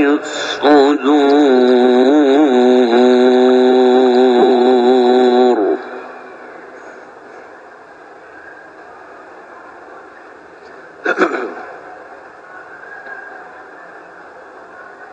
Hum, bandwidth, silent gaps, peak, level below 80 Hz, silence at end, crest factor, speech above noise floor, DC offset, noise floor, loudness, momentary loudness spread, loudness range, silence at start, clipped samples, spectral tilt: none; 8 kHz; none; 0 dBFS; -64 dBFS; 0.05 s; 14 dB; 28 dB; under 0.1%; -38 dBFS; -11 LUFS; 24 LU; 20 LU; 0 s; under 0.1%; -4.5 dB/octave